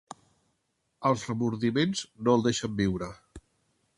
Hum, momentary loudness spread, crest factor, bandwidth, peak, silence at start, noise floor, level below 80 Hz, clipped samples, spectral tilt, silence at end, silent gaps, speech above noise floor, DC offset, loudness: none; 6 LU; 20 dB; 11.5 kHz; -10 dBFS; 1 s; -77 dBFS; -56 dBFS; under 0.1%; -5.5 dB/octave; 0.6 s; none; 49 dB; under 0.1%; -28 LUFS